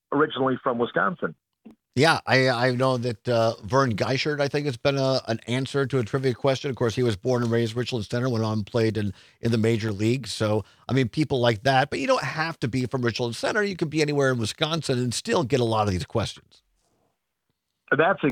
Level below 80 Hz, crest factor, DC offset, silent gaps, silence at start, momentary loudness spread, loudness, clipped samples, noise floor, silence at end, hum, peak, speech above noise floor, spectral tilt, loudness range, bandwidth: -60 dBFS; 22 dB; under 0.1%; none; 0.1 s; 6 LU; -24 LUFS; under 0.1%; -79 dBFS; 0 s; none; -4 dBFS; 55 dB; -5.5 dB/octave; 3 LU; 15 kHz